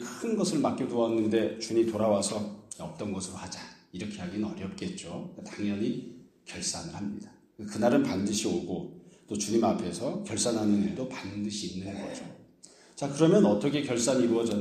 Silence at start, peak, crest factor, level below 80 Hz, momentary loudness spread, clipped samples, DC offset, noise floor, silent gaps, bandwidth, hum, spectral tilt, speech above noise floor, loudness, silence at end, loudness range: 0 s; -8 dBFS; 20 dB; -66 dBFS; 16 LU; under 0.1%; under 0.1%; -56 dBFS; none; 13.5 kHz; none; -5 dB/octave; 27 dB; -30 LUFS; 0 s; 7 LU